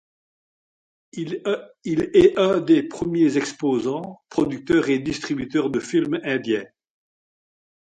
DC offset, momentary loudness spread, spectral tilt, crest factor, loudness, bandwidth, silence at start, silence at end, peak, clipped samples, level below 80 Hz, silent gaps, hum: under 0.1%; 11 LU; -6 dB/octave; 20 dB; -22 LUFS; 9.2 kHz; 1.15 s; 1.25 s; -4 dBFS; under 0.1%; -54 dBFS; none; none